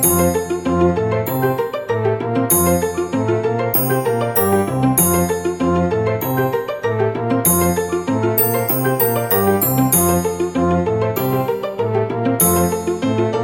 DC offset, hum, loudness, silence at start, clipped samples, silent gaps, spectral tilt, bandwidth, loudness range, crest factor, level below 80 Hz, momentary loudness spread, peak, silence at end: under 0.1%; none; -17 LUFS; 0 s; under 0.1%; none; -5.5 dB/octave; 17 kHz; 2 LU; 16 dB; -42 dBFS; 6 LU; 0 dBFS; 0 s